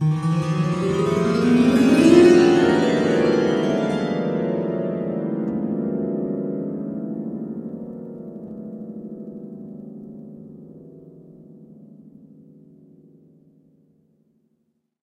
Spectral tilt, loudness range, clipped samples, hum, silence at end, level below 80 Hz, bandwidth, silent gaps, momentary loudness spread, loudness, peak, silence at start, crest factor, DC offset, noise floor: -7 dB/octave; 22 LU; under 0.1%; none; 3.2 s; -56 dBFS; 12 kHz; none; 22 LU; -19 LUFS; 0 dBFS; 0 s; 22 dB; under 0.1%; -70 dBFS